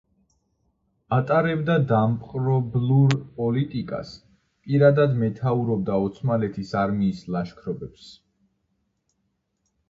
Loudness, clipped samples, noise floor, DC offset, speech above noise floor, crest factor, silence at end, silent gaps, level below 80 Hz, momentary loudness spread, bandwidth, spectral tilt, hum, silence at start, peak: -23 LUFS; under 0.1%; -74 dBFS; under 0.1%; 52 dB; 20 dB; 1.8 s; none; -56 dBFS; 13 LU; 7.6 kHz; -8.5 dB/octave; none; 1.1 s; -4 dBFS